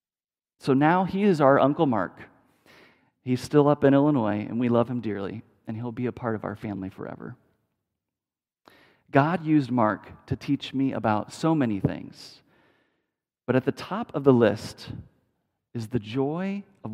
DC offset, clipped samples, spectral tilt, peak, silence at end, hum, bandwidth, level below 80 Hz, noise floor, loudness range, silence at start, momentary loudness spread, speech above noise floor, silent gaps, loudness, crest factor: under 0.1%; under 0.1%; -7.5 dB/octave; -4 dBFS; 0 s; none; 12.5 kHz; -62 dBFS; under -90 dBFS; 9 LU; 0.65 s; 18 LU; over 66 dB; none; -25 LUFS; 22 dB